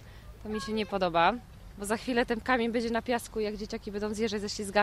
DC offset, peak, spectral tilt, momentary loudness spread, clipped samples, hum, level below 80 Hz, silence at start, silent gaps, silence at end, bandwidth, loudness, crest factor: under 0.1%; -12 dBFS; -4.5 dB/octave; 13 LU; under 0.1%; none; -50 dBFS; 0 s; none; 0 s; 15.5 kHz; -31 LUFS; 20 dB